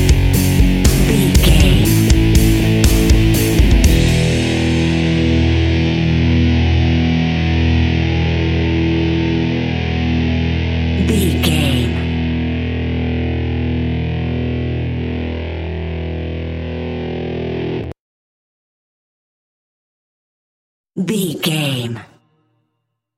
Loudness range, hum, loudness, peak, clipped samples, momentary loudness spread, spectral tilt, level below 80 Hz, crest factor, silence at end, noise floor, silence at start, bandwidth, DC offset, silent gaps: 13 LU; none; -16 LUFS; 0 dBFS; under 0.1%; 11 LU; -6 dB/octave; -20 dBFS; 14 dB; 1.15 s; -73 dBFS; 0 s; 17 kHz; under 0.1%; 18.00-20.84 s